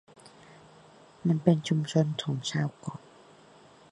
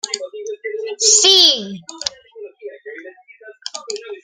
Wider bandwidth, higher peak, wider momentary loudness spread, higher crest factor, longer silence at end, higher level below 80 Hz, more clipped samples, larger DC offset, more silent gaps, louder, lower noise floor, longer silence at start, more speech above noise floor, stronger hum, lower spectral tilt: second, 10.5 kHz vs 16.5 kHz; second, -6 dBFS vs 0 dBFS; second, 17 LU vs 26 LU; about the same, 24 dB vs 20 dB; first, 0.95 s vs 0.05 s; second, -70 dBFS vs -64 dBFS; neither; neither; neither; second, -28 LUFS vs -13 LUFS; first, -56 dBFS vs -43 dBFS; first, 1.25 s vs 0.05 s; about the same, 28 dB vs 29 dB; neither; first, -6.5 dB/octave vs 0.5 dB/octave